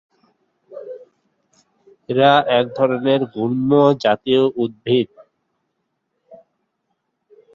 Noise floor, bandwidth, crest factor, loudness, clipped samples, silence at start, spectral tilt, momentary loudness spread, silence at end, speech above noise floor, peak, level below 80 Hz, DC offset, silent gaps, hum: -73 dBFS; 7.2 kHz; 18 dB; -17 LUFS; under 0.1%; 0.7 s; -7.5 dB/octave; 21 LU; 1.2 s; 57 dB; -2 dBFS; -64 dBFS; under 0.1%; none; none